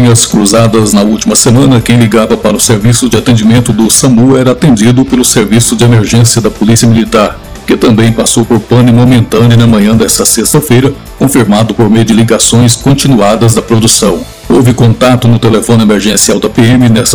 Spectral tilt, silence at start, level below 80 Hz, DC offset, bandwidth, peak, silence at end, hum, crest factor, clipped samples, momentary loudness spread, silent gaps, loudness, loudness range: -5 dB/octave; 0 s; -28 dBFS; 2%; over 20 kHz; 0 dBFS; 0 s; none; 6 dB; 20%; 3 LU; none; -6 LUFS; 1 LU